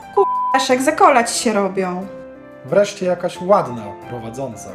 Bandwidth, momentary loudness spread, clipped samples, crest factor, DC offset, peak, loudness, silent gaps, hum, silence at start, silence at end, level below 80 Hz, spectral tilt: 15 kHz; 18 LU; under 0.1%; 18 dB; under 0.1%; 0 dBFS; -17 LUFS; none; none; 0 s; 0 s; -56 dBFS; -4 dB/octave